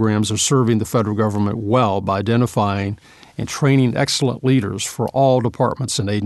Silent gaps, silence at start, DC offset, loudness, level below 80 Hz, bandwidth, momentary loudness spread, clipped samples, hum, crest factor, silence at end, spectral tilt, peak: none; 0 s; under 0.1%; -18 LUFS; -50 dBFS; 12.5 kHz; 8 LU; under 0.1%; none; 16 dB; 0 s; -5.5 dB/octave; -2 dBFS